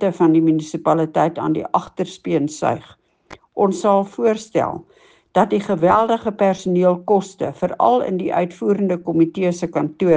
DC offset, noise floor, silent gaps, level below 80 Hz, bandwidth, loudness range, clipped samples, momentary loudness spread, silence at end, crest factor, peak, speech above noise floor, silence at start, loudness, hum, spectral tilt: under 0.1%; -45 dBFS; none; -58 dBFS; 9.4 kHz; 3 LU; under 0.1%; 7 LU; 0 s; 18 dB; -2 dBFS; 27 dB; 0 s; -19 LUFS; none; -7 dB/octave